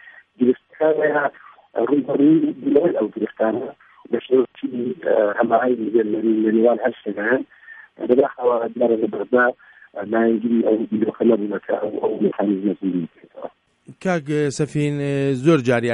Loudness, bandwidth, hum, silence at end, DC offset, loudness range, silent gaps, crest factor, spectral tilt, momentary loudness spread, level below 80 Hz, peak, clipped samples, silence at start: -20 LUFS; 10.5 kHz; none; 0 s; under 0.1%; 3 LU; none; 16 dB; -7.5 dB/octave; 10 LU; -66 dBFS; -2 dBFS; under 0.1%; 0.05 s